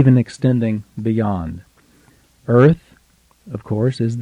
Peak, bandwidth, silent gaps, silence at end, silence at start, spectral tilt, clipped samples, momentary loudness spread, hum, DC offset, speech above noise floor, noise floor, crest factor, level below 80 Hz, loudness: -2 dBFS; 9.8 kHz; none; 0 s; 0 s; -9 dB/octave; under 0.1%; 20 LU; none; under 0.1%; 39 dB; -56 dBFS; 16 dB; -46 dBFS; -18 LUFS